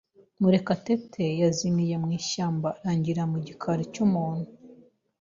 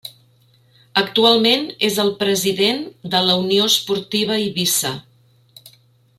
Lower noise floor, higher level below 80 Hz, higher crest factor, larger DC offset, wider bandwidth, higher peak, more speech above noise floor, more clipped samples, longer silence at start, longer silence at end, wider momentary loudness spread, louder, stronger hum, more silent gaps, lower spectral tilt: about the same, -55 dBFS vs -55 dBFS; about the same, -62 dBFS vs -62 dBFS; about the same, 16 dB vs 18 dB; neither; second, 7.6 kHz vs 16 kHz; second, -10 dBFS vs 0 dBFS; second, 29 dB vs 37 dB; neither; first, 0.4 s vs 0.05 s; about the same, 0.45 s vs 0.5 s; about the same, 7 LU vs 8 LU; second, -27 LUFS vs -17 LUFS; neither; neither; first, -6.5 dB/octave vs -3 dB/octave